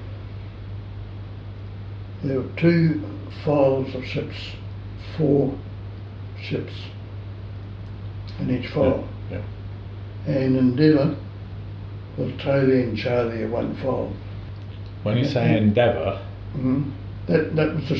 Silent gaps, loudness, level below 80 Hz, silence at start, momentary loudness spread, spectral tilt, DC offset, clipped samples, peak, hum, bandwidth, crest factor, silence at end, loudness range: none; -23 LUFS; -44 dBFS; 0 s; 17 LU; -9 dB/octave; under 0.1%; under 0.1%; -4 dBFS; none; 6.6 kHz; 18 dB; 0 s; 6 LU